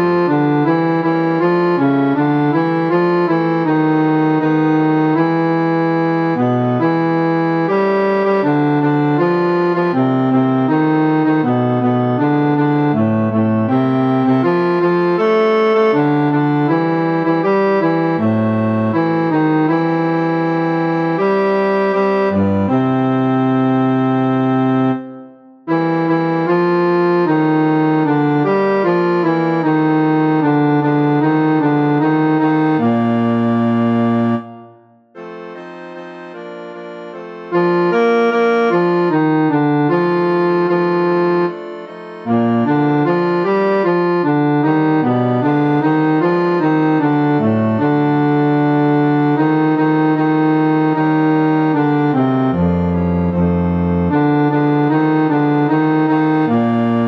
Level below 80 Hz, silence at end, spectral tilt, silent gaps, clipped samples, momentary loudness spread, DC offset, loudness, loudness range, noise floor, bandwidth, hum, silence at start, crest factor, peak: -48 dBFS; 0 s; -9.5 dB/octave; none; under 0.1%; 2 LU; under 0.1%; -15 LUFS; 2 LU; -45 dBFS; 6 kHz; none; 0 s; 12 dB; -2 dBFS